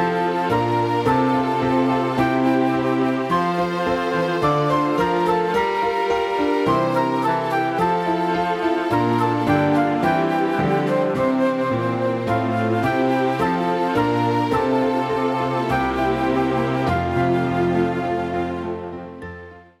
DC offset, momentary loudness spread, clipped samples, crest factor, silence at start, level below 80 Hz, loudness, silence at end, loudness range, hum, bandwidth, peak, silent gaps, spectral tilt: under 0.1%; 3 LU; under 0.1%; 14 dB; 0 s; -46 dBFS; -20 LUFS; 0.2 s; 1 LU; none; 14 kHz; -6 dBFS; none; -7 dB/octave